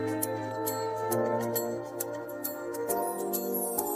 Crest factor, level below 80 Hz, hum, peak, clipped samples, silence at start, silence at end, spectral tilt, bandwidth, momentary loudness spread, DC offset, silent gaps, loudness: 20 dB; -70 dBFS; none; -12 dBFS; under 0.1%; 0 s; 0 s; -4.5 dB/octave; 16 kHz; 6 LU; under 0.1%; none; -32 LUFS